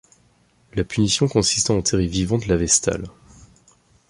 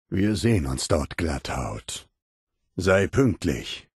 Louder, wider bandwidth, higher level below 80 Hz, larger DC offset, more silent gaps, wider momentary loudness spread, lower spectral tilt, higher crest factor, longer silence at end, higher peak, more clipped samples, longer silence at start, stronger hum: first, -20 LUFS vs -25 LUFS; about the same, 11.5 kHz vs 12.5 kHz; about the same, -40 dBFS vs -40 dBFS; neither; second, none vs 2.22-2.47 s; about the same, 11 LU vs 13 LU; second, -4 dB/octave vs -5.5 dB/octave; about the same, 18 dB vs 18 dB; first, 1 s vs 0.15 s; about the same, -4 dBFS vs -6 dBFS; neither; first, 0.75 s vs 0.1 s; first, 60 Hz at -40 dBFS vs none